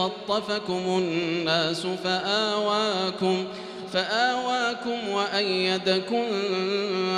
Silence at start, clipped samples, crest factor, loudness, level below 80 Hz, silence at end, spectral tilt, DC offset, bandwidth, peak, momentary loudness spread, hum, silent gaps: 0 s; under 0.1%; 18 dB; -25 LUFS; -70 dBFS; 0 s; -4.5 dB/octave; under 0.1%; 11.5 kHz; -8 dBFS; 5 LU; none; none